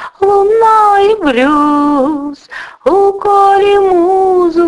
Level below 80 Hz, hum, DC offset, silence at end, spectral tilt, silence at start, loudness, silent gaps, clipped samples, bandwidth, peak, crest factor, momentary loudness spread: -44 dBFS; none; under 0.1%; 0 s; -5 dB/octave; 0 s; -9 LUFS; none; under 0.1%; 11 kHz; 0 dBFS; 10 dB; 9 LU